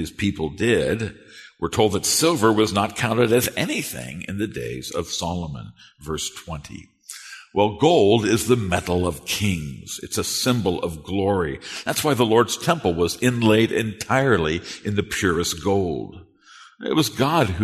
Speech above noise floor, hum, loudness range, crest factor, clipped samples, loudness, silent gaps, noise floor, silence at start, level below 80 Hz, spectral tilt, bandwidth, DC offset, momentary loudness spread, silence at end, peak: 27 dB; none; 6 LU; 18 dB; under 0.1%; -21 LUFS; none; -49 dBFS; 0 s; -46 dBFS; -4.5 dB/octave; 13.5 kHz; under 0.1%; 14 LU; 0 s; -2 dBFS